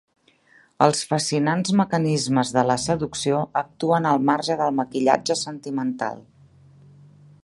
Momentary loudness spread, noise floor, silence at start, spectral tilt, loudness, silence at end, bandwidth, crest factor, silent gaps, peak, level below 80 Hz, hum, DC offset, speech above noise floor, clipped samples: 7 LU; -57 dBFS; 0.8 s; -5 dB/octave; -22 LUFS; 1.25 s; 11.5 kHz; 22 dB; none; 0 dBFS; -60 dBFS; none; under 0.1%; 35 dB; under 0.1%